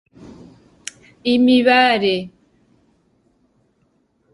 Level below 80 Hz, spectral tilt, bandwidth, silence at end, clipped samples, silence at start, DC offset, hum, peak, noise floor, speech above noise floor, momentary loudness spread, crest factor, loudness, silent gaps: -60 dBFS; -4.5 dB/octave; 11.5 kHz; 2.05 s; under 0.1%; 1.25 s; under 0.1%; none; 0 dBFS; -63 dBFS; 49 dB; 23 LU; 20 dB; -15 LUFS; none